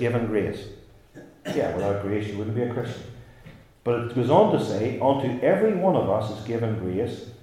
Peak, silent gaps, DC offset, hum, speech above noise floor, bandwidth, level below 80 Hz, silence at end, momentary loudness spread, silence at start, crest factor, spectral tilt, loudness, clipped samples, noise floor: -4 dBFS; none; under 0.1%; none; 24 dB; 14.5 kHz; -56 dBFS; 0.05 s; 12 LU; 0 s; 20 dB; -7.5 dB/octave; -24 LUFS; under 0.1%; -48 dBFS